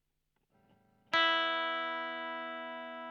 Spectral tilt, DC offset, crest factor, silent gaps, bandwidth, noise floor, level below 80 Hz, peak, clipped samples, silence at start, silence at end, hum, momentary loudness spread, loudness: -2 dB/octave; under 0.1%; 22 dB; none; 10 kHz; -81 dBFS; -86 dBFS; -16 dBFS; under 0.1%; 1.1 s; 0 s; none; 14 LU; -33 LUFS